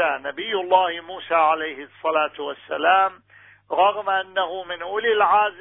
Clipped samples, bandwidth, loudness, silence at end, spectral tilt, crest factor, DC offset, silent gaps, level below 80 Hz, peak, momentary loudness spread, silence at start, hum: under 0.1%; 3.9 kHz; -21 LUFS; 0 s; -6.5 dB/octave; 18 dB; under 0.1%; none; -68 dBFS; -4 dBFS; 11 LU; 0 s; none